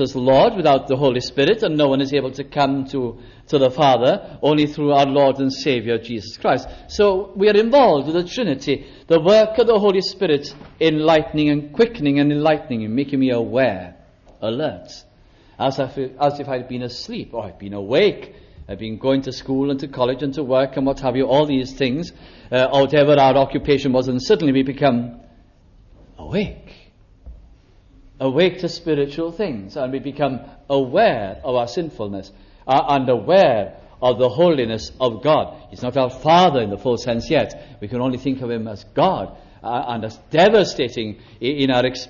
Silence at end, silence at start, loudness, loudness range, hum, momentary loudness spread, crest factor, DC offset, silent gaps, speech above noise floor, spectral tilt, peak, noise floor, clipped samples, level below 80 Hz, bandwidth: 0 s; 0 s; -18 LUFS; 7 LU; none; 14 LU; 16 dB; under 0.1%; none; 32 dB; -6.5 dB/octave; -4 dBFS; -50 dBFS; under 0.1%; -46 dBFS; 7.2 kHz